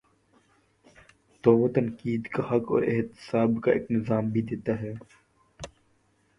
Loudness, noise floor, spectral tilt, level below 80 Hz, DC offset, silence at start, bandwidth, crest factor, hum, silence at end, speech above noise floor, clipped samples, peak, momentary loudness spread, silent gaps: -27 LUFS; -67 dBFS; -8.5 dB/octave; -60 dBFS; under 0.1%; 1.45 s; 10.5 kHz; 22 dB; none; 0.7 s; 41 dB; under 0.1%; -6 dBFS; 20 LU; none